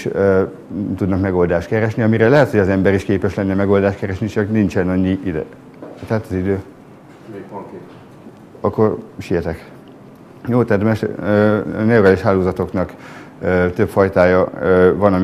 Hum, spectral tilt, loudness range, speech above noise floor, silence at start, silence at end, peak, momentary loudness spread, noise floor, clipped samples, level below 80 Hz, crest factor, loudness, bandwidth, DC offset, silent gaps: none; -8.5 dB/octave; 8 LU; 25 dB; 0 s; 0 s; 0 dBFS; 19 LU; -41 dBFS; under 0.1%; -48 dBFS; 16 dB; -16 LUFS; 14 kHz; under 0.1%; none